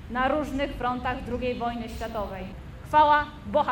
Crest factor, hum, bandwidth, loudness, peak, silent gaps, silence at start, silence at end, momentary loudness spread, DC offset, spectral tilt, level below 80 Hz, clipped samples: 18 dB; none; 17 kHz; -26 LUFS; -10 dBFS; none; 0 s; 0 s; 14 LU; under 0.1%; -6 dB/octave; -42 dBFS; under 0.1%